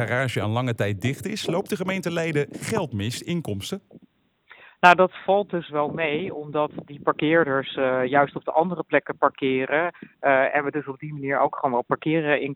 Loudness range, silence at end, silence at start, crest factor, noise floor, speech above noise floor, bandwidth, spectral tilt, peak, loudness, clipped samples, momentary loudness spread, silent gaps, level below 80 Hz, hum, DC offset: 5 LU; 0 s; 0 s; 22 dB; -60 dBFS; 37 dB; 17 kHz; -5.5 dB/octave; -2 dBFS; -23 LUFS; under 0.1%; 9 LU; none; -64 dBFS; none; under 0.1%